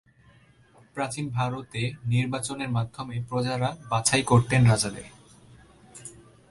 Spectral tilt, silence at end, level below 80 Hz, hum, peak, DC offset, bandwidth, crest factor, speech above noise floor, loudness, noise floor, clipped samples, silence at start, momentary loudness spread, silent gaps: -5 dB/octave; 0.4 s; -54 dBFS; none; -6 dBFS; under 0.1%; 11.5 kHz; 20 dB; 32 dB; -26 LUFS; -57 dBFS; under 0.1%; 0.95 s; 22 LU; none